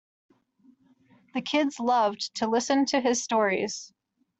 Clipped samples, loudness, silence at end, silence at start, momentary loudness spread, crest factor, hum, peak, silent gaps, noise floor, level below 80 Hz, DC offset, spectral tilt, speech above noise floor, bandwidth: under 0.1%; -26 LUFS; 0.55 s; 1.35 s; 9 LU; 18 dB; none; -10 dBFS; none; -62 dBFS; -74 dBFS; under 0.1%; -3 dB/octave; 36 dB; 8.2 kHz